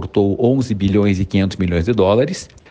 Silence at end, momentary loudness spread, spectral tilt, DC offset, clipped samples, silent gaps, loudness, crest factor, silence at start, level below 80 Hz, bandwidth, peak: 0.25 s; 4 LU; -7 dB/octave; under 0.1%; under 0.1%; none; -16 LUFS; 14 dB; 0 s; -38 dBFS; 9.4 kHz; -4 dBFS